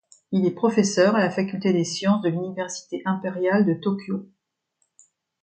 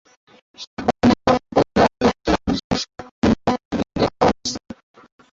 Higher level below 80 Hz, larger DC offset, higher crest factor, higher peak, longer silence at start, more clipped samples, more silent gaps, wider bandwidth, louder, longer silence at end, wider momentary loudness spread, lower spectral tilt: second, -70 dBFS vs -40 dBFS; neither; about the same, 18 dB vs 18 dB; second, -6 dBFS vs -2 dBFS; second, 0.3 s vs 0.6 s; neither; second, none vs 0.67-0.77 s, 2.64-2.70 s, 3.11-3.22 s, 3.65-3.71 s; first, 9.2 kHz vs 7.8 kHz; second, -23 LUFS vs -20 LUFS; first, 1.15 s vs 0.65 s; second, 10 LU vs 14 LU; about the same, -5.5 dB/octave vs -5.5 dB/octave